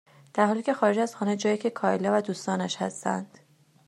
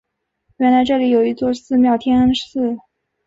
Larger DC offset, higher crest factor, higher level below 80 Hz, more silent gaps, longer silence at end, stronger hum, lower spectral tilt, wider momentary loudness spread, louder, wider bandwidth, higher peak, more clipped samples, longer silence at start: neither; first, 18 dB vs 12 dB; second, -78 dBFS vs -48 dBFS; neither; about the same, 0.6 s vs 0.5 s; neither; about the same, -5 dB/octave vs -6 dB/octave; about the same, 7 LU vs 7 LU; second, -27 LUFS vs -16 LUFS; first, 12 kHz vs 7.6 kHz; second, -8 dBFS vs -4 dBFS; neither; second, 0.35 s vs 0.6 s